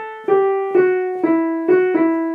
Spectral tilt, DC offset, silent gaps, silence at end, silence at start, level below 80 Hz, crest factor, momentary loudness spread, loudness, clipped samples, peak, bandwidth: -8.5 dB/octave; under 0.1%; none; 0 s; 0 s; -78 dBFS; 14 dB; 3 LU; -17 LUFS; under 0.1%; -4 dBFS; 3.6 kHz